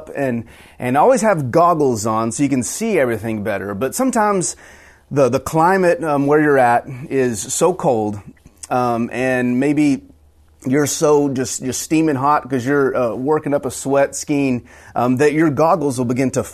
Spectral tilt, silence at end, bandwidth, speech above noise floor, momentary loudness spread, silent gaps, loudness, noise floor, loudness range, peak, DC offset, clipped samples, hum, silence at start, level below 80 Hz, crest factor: -5.5 dB/octave; 0 s; 14 kHz; 34 dB; 8 LU; none; -17 LUFS; -50 dBFS; 3 LU; -4 dBFS; under 0.1%; under 0.1%; none; 0 s; -52 dBFS; 14 dB